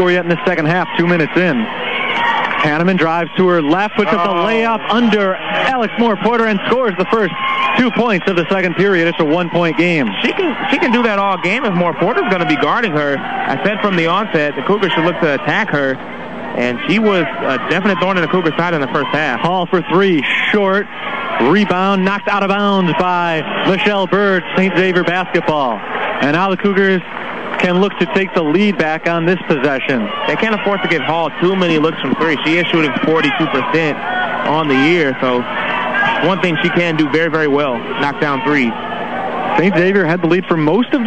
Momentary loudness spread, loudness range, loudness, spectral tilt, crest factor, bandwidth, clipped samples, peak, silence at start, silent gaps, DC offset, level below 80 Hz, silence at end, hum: 4 LU; 1 LU; -14 LUFS; -6.5 dB/octave; 14 dB; 8.6 kHz; under 0.1%; -2 dBFS; 0 s; none; 2%; -52 dBFS; 0 s; none